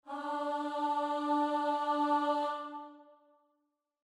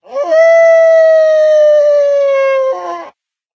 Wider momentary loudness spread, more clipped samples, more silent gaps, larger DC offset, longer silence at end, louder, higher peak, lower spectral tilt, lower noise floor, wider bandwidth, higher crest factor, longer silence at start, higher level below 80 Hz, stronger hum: about the same, 11 LU vs 11 LU; neither; neither; neither; first, 1 s vs 0.45 s; second, -33 LUFS vs -8 LUFS; second, -20 dBFS vs 0 dBFS; first, -3 dB/octave vs -1.5 dB/octave; first, -82 dBFS vs -40 dBFS; first, 11 kHz vs 6.8 kHz; first, 16 dB vs 10 dB; about the same, 0.05 s vs 0.1 s; second, -88 dBFS vs -80 dBFS; neither